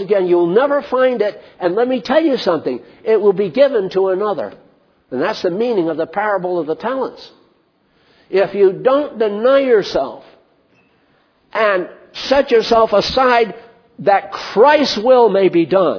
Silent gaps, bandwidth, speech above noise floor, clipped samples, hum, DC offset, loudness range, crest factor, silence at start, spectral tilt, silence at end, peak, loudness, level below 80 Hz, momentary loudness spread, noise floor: none; 5.4 kHz; 43 dB; under 0.1%; none; under 0.1%; 6 LU; 16 dB; 0 s; -5.5 dB/octave; 0 s; 0 dBFS; -15 LUFS; -52 dBFS; 10 LU; -58 dBFS